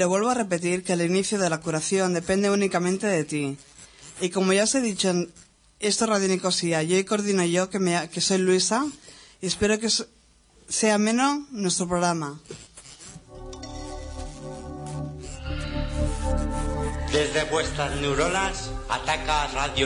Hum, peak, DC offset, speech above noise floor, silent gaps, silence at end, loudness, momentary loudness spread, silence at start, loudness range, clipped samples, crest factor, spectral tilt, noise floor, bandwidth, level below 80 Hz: none; -8 dBFS; under 0.1%; 33 dB; none; 0 s; -24 LUFS; 16 LU; 0 s; 9 LU; under 0.1%; 18 dB; -4 dB/octave; -57 dBFS; 11 kHz; -38 dBFS